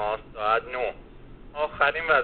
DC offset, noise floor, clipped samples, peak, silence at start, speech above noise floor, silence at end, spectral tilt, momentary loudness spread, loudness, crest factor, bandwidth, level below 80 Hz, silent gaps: 0.1%; -45 dBFS; under 0.1%; -8 dBFS; 0 s; 20 dB; 0 s; -0.5 dB/octave; 13 LU; -26 LUFS; 20 dB; 4.6 kHz; -48 dBFS; none